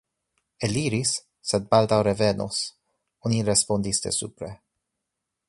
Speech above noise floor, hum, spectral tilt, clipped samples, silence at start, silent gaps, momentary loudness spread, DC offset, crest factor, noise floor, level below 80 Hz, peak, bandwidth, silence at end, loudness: 59 dB; none; -4 dB/octave; under 0.1%; 0.6 s; none; 12 LU; under 0.1%; 22 dB; -83 dBFS; -54 dBFS; -4 dBFS; 11.5 kHz; 0.95 s; -24 LUFS